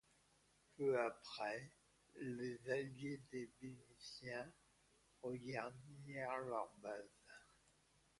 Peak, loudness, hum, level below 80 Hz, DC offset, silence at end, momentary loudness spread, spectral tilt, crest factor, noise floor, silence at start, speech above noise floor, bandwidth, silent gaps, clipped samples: -26 dBFS; -48 LUFS; none; -82 dBFS; under 0.1%; 0.75 s; 16 LU; -5.5 dB/octave; 22 dB; -76 dBFS; 0.8 s; 29 dB; 11.5 kHz; none; under 0.1%